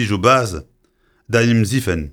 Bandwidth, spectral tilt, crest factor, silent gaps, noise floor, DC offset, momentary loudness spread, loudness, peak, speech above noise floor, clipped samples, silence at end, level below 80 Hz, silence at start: 17.5 kHz; -5.5 dB/octave; 16 dB; none; -60 dBFS; under 0.1%; 10 LU; -16 LUFS; -2 dBFS; 44 dB; under 0.1%; 0 s; -40 dBFS; 0 s